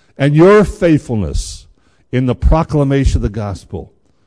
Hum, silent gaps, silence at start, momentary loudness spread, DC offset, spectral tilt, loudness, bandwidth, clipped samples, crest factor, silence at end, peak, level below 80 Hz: none; none; 0.2 s; 19 LU; under 0.1%; -7.5 dB/octave; -13 LUFS; 11 kHz; under 0.1%; 12 dB; 0.45 s; 0 dBFS; -22 dBFS